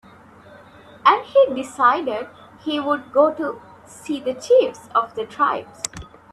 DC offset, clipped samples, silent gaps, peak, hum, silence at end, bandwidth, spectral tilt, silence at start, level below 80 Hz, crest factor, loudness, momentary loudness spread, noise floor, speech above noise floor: under 0.1%; under 0.1%; none; 0 dBFS; none; 0.3 s; 12.5 kHz; -3.5 dB/octave; 1.05 s; -56 dBFS; 20 dB; -20 LUFS; 13 LU; -46 dBFS; 26 dB